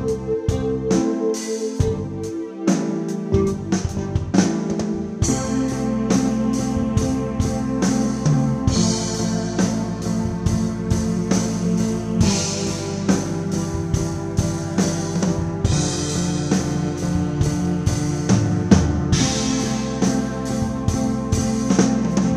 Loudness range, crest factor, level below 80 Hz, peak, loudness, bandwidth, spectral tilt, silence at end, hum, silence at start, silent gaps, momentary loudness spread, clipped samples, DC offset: 2 LU; 20 dB; -34 dBFS; 0 dBFS; -21 LUFS; 14 kHz; -5.5 dB/octave; 0 s; none; 0 s; none; 5 LU; under 0.1%; under 0.1%